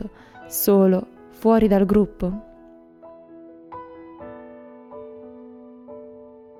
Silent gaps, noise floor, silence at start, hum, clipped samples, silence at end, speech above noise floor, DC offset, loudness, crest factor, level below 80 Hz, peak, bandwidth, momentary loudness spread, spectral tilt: none; -48 dBFS; 0 s; none; under 0.1%; 0.5 s; 30 dB; under 0.1%; -19 LUFS; 18 dB; -46 dBFS; -6 dBFS; 16.5 kHz; 26 LU; -7 dB/octave